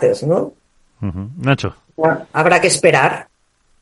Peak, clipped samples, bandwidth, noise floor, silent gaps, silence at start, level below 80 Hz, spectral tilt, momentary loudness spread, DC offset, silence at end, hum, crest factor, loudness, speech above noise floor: 0 dBFS; under 0.1%; 12 kHz; -59 dBFS; none; 0 s; -48 dBFS; -4.5 dB/octave; 15 LU; under 0.1%; 0.6 s; none; 16 dB; -16 LUFS; 43 dB